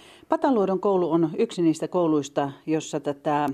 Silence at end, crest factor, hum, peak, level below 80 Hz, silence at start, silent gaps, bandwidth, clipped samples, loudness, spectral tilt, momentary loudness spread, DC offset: 0 s; 18 dB; none; -6 dBFS; -68 dBFS; 0.3 s; none; 11 kHz; under 0.1%; -24 LUFS; -6.5 dB/octave; 6 LU; under 0.1%